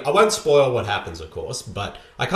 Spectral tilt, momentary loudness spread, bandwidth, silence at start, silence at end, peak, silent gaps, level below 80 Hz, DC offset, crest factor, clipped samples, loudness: -4 dB/octave; 15 LU; 14 kHz; 0 s; 0 s; -6 dBFS; none; -48 dBFS; under 0.1%; 16 dB; under 0.1%; -21 LUFS